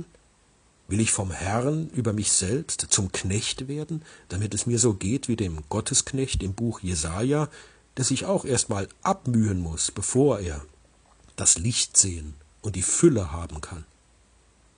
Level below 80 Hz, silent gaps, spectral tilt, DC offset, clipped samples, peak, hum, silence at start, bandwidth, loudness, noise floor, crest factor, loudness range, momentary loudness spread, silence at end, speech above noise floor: -44 dBFS; none; -4 dB/octave; under 0.1%; under 0.1%; -2 dBFS; none; 0 s; 10 kHz; -24 LUFS; -61 dBFS; 24 dB; 3 LU; 15 LU; 0.95 s; 35 dB